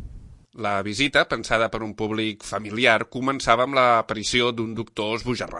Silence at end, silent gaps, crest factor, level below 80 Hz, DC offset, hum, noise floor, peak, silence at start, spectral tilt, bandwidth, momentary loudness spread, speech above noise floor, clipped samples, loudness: 0 s; none; 22 dB; -48 dBFS; under 0.1%; none; -43 dBFS; -2 dBFS; 0 s; -4 dB/octave; 11.5 kHz; 10 LU; 20 dB; under 0.1%; -22 LUFS